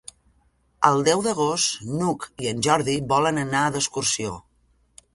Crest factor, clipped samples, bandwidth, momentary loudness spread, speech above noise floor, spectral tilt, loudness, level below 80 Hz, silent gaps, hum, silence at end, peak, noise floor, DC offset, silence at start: 24 dB; under 0.1%; 11.5 kHz; 7 LU; 41 dB; -3.5 dB/octave; -22 LUFS; -56 dBFS; none; none; 0.75 s; 0 dBFS; -64 dBFS; under 0.1%; 0.8 s